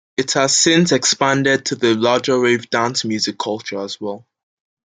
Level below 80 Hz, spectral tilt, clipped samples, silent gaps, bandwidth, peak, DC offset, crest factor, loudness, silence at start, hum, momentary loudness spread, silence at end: -62 dBFS; -3 dB/octave; under 0.1%; none; 9.6 kHz; -2 dBFS; under 0.1%; 16 dB; -16 LUFS; 0.2 s; none; 13 LU; 0.7 s